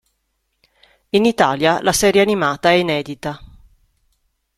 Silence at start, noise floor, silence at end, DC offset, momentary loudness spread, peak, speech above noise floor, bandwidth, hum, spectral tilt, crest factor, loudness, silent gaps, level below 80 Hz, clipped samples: 1.15 s; -70 dBFS; 1.1 s; under 0.1%; 14 LU; -2 dBFS; 54 dB; 15 kHz; none; -4 dB/octave; 18 dB; -16 LUFS; none; -48 dBFS; under 0.1%